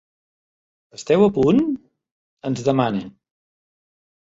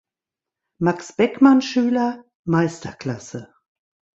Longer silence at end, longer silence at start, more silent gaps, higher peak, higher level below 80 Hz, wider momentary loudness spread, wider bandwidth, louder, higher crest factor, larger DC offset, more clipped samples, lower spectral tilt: first, 1.25 s vs 0.7 s; first, 1 s vs 0.8 s; first, 2.11-2.37 s vs 2.35-2.44 s; about the same, -4 dBFS vs -2 dBFS; first, -54 dBFS vs -60 dBFS; about the same, 17 LU vs 17 LU; about the same, 8 kHz vs 8 kHz; about the same, -19 LUFS vs -20 LUFS; about the same, 20 dB vs 20 dB; neither; neither; about the same, -7 dB/octave vs -6.5 dB/octave